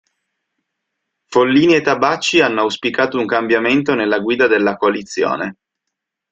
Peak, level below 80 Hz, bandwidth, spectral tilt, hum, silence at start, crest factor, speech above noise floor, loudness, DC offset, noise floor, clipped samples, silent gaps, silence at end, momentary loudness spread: 0 dBFS; -58 dBFS; 9 kHz; -4.5 dB/octave; none; 1.3 s; 16 dB; 64 dB; -15 LUFS; under 0.1%; -79 dBFS; under 0.1%; none; 0.8 s; 7 LU